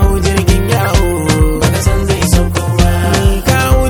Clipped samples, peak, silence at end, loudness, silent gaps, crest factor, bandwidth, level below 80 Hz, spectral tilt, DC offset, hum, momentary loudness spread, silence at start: 0.5%; 0 dBFS; 0 s; -12 LUFS; none; 10 dB; over 20 kHz; -16 dBFS; -5.5 dB/octave; under 0.1%; none; 2 LU; 0 s